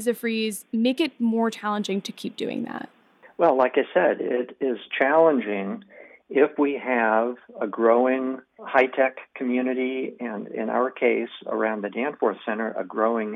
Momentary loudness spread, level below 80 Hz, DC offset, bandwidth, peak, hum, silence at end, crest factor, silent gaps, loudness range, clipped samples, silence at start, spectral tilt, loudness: 11 LU; -76 dBFS; under 0.1%; 15 kHz; -6 dBFS; none; 0 s; 18 dB; none; 4 LU; under 0.1%; 0 s; -5 dB/octave; -24 LUFS